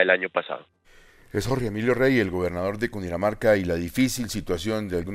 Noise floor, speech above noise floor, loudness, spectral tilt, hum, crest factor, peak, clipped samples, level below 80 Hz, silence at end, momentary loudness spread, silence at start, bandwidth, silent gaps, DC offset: -53 dBFS; 29 dB; -25 LUFS; -5.5 dB/octave; none; 20 dB; -4 dBFS; under 0.1%; -46 dBFS; 0 s; 9 LU; 0 s; 15.5 kHz; none; under 0.1%